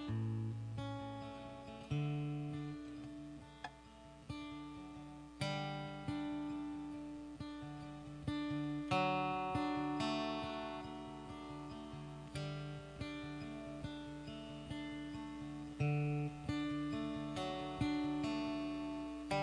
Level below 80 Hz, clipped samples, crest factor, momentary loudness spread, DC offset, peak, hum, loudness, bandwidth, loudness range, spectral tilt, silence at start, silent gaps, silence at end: -62 dBFS; under 0.1%; 18 dB; 12 LU; under 0.1%; -24 dBFS; none; -43 LUFS; 10.5 kHz; 8 LU; -6.5 dB/octave; 0 s; none; 0 s